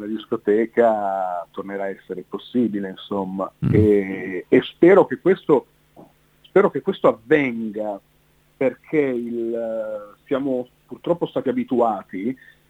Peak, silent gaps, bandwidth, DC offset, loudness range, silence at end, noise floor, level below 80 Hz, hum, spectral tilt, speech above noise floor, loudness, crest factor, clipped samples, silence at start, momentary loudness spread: -4 dBFS; none; 8 kHz; under 0.1%; 6 LU; 0.35 s; -59 dBFS; -56 dBFS; none; -8.5 dB/octave; 39 dB; -21 LUFS; 18 dB; under 0.1%; 0 s; 13 LU